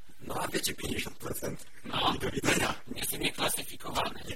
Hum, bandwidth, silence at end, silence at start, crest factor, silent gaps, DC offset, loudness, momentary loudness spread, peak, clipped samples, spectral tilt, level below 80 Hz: none; 16.5 kHz; 0 s; 0.2 s; 22 dB; none; 1%; -32 LUFS; 9 LU; -12 dBFS; under 0.1%; -3 dB/octave; -50 dBFS